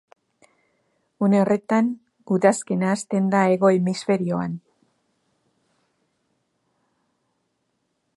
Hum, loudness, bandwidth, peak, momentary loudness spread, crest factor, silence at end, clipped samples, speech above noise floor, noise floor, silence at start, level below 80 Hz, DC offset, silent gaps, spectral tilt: none; -21 LUFS; 11.5 kHz; -4 dBFS; 8 LU; 20 dB; 3.6 s; under 0.1%; 53 dB; -73 dBFS; 1.2 s; -70 dBFS; under 0.1%; none; -6.5 dB/octave